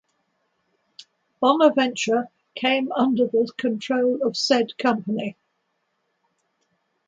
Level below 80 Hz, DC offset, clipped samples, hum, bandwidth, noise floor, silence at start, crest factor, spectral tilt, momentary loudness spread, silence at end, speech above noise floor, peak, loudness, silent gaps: -74 dBFS; under 0.1%; under 0.1%; none; 9 kHz; -73 dBFS; 1 s; 20 dB; -4 dB/octave; 9 LU; 1.75 s; 52 dB; -4 dBFS; -22 LUFS; none